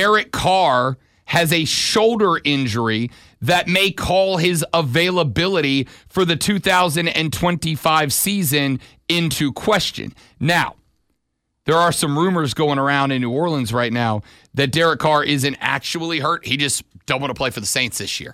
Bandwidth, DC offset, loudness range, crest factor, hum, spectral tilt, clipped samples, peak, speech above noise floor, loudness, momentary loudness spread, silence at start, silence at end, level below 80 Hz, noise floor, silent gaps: 16.5 kHz; under 0.1%; 2 LU; 16 dB; none; -4 dB/octave; under 0.1%; -2 dBFS; 55 dB; -18 LUFS; 8 LU; 0 s; 0 s; -46 dBFS; -73 dBFS; none